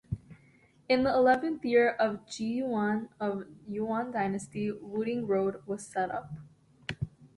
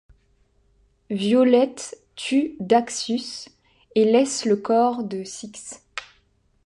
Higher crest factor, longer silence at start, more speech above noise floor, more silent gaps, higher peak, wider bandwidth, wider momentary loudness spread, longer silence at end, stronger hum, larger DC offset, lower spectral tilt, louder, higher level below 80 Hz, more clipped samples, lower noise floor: about the same, 18 dB vs 18 dB; second, 0.1 s vs 1.1 s; second, 32 dB vs 42 dB; neither; second, -14 dBFS vs -4 dBFS; about the same, 11.5 kHz vs 11.5 kHz; second, 15 LU vs 18 LU; second, 0.1 s vs 0.6 s; neither; neither; first, -6 dB/octave vs -4.5 dB/octave; second, -31 LUFS vs -21 LUFS; about the same, -60 dBFS vs -64 dBFS; neither; about the same, -62 dBFS vs -63 dBFS